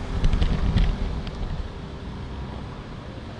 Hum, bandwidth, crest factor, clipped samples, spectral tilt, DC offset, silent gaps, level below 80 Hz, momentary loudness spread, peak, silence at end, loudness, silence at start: none; 8.6 kHz; 16 dB; under 0.1%; -7 dB/octave; under 0.1%; none; -26 dBFS; 13 LU; -8 dBFS; 0 s; -29 LUFS; 0 s